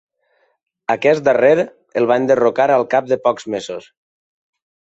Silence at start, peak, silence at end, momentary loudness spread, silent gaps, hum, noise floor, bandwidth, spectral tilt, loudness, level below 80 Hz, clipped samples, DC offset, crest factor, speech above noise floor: 0.9 s; -2 dBFS; 1.05 s; 12 LU; none; none; -63 dBFS; 8.2 kHz; -5.5 dB/octave; -16 LUFS; -64 dBFS; under 0.1%; under 0.1%; 16 dB; 47 dB